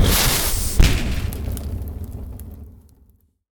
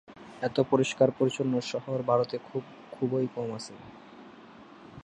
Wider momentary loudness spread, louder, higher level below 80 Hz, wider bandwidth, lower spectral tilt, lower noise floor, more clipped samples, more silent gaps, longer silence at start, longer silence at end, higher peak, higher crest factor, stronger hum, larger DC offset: second, 20 LU vs 24 LU; first, -21 LUFS vs -29 LUFS; first, -24 dBFS vs -68 dBFS; first, over 20 kHz vs 10.5 kHz; second, -3.5 dB/octave vs -6 dB/octave; first, -56 dBFS vs -51 dBFS; neither; neither; about the same, 0 s vs 0.1 s; first, 0.8 s vs 0.05 s; first, -2 dBFS vs -10 dBFS; about the same, 20 dB vs 20 dB; neither; neither